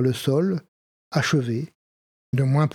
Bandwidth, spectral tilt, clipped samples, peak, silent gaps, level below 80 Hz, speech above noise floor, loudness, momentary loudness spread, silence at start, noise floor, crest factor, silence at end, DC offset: 15 kHz; -6.5 dB/octave; under 0.1%; -6 dBFS; 0.68-1.11 s, 1.75-2.33 s; -64 dBFS; over 68 dB; -24 LUFS; 9 LU; 0 s; under -90 dBFS; 16 dB; 0.05 s; under 0.1%